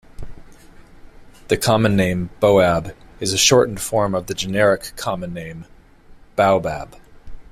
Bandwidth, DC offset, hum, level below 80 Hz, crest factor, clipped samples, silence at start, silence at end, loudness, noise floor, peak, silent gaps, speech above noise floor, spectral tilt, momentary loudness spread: 16 kHz; under 0.1%; none; -42 dBFS; 18 dB; under 0.1%; 0.2 s; 0.1 s; -18 LUFS; -45 dBFS; -2 dBFS; none; 27 dB; -4 dB/octave; 17 LU